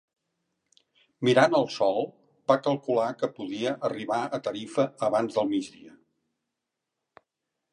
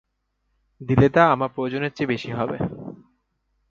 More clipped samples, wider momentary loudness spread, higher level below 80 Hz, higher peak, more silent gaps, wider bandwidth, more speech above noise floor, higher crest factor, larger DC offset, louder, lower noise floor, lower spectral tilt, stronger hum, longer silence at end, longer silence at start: neither; second, 10 LU vs 19 LU; second, -78 dBFS vs -50 dBFS; second, -6 dBFS vs -2 dBFS; neither; first, 10.5 kHz vs 7.2 kHz; first, 59 dB vs 52 dB; about the same, 24 dB vs 22 dB; neither; second, -27 LUFS vs -22 LUFS; first, -85 dBFS vs -73 dBFS; second, -5.5 dB/octave vs -8 dB/octave; neither; first, 1.85 s vs 0.75 s; first, 1.2 s vs 0.8 s